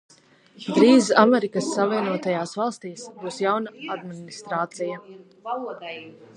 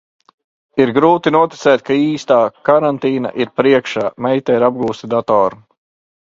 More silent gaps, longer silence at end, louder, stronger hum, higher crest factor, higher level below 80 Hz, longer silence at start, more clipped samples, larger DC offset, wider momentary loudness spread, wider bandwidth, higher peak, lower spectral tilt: neither; second, 0.25 s vs 0.75 s; second, -22 LUFS vs -15 LUFS; neither; first, 22 dB vs 14 dB; second, -76 dBFS vs -56 dBFS; second, 0.6 s vs 0.75 s; neither; neither; first, 21 LU vs 7 LU; first, 11 kHz vs 7.6 kHz; about the same, -2 dBFS vs 0 dBFS; second, -5 dB/octave vs -6.5 dB/octave